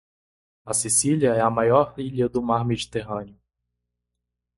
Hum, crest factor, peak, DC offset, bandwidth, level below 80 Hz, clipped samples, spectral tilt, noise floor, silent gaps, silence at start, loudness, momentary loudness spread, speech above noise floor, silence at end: 60 Hz at -35 dBFS; 20 dB; -4 dBFS; under 0.1%; 11.5 kHz; -54 dBFS; under 0.1%; -4.5 dB/octave; -82 dBFS; none; 0.65 s; -22 LUFS; 10 LU; 60 dB; 1.25 s